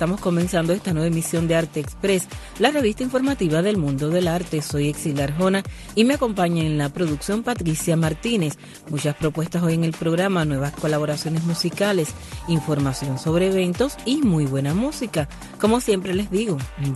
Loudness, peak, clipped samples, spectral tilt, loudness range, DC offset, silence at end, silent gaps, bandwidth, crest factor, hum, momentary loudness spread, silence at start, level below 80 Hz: -22 LUFS; -2 dBFS; under 0.1%; -5.5 dB/octave; 1 LU; under 0.1%; 0 s; none; 12.5 kHz; 20 dB; none; 5 LU; 0 s; -42 dBFS